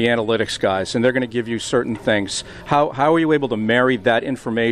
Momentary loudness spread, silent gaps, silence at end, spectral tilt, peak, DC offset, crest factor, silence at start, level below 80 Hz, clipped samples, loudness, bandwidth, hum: 6 LU; none; 0 s; -5 dB/octave; -4 dBFS; under 0.1%; 14 dB; 0 s; -50 dBFS; under 0.1%; -19 LUFS; 12.5 kHz; none